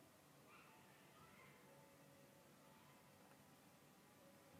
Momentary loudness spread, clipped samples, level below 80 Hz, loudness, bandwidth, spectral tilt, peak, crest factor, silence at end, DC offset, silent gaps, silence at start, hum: 3 LU; under 0.1%; under -90 dBFS; -67 LUFS; 15.5 kHz; -4 dB/octave; -52 dBFS; 14 dB; 0 s; under 0.1%; none; 0 s; none